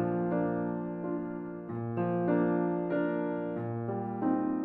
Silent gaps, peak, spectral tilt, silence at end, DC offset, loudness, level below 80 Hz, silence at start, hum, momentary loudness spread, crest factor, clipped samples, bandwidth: none; -18 dBFS; -12 dB/octave; 0 s; under 0.1%; -32 LUFS; -66 dBFS; 0 s; none; 8 LU; 14 dB; under 0.1%; 3.8 kHz